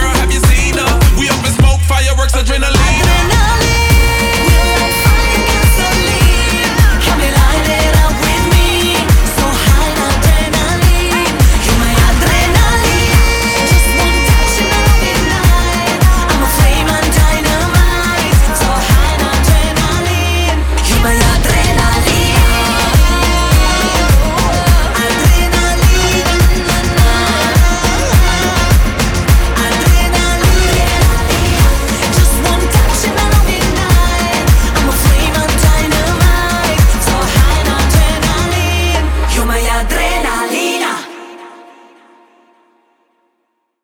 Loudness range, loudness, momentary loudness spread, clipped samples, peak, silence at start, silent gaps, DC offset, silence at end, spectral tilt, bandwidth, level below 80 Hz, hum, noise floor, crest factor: 2 LU; -11 LUFS; 3 LU; under 0.1%; 0 dBFS; 0 s; none; under 0.1%; 2.25 s; -4 dB/octave; 18.5 kHz; -12 dBFS; none; -66 dBFS; 10 dB